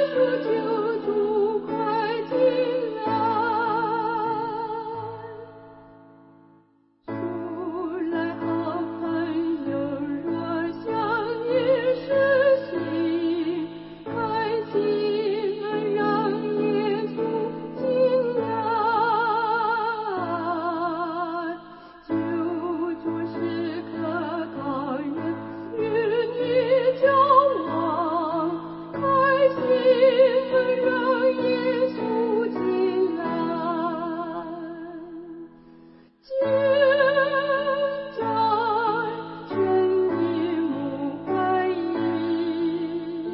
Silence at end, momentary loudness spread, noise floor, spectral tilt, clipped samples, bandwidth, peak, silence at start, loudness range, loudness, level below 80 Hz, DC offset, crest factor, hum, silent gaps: 0 s; 11 LU; -61 dBFS; -10 dB/octave; under 0.1%; 5.8 kHz; -6 dBFS; 0 s; 8 LU; -24 LUFS; -64 dBFS; under 0.1%; 18 dB; none; none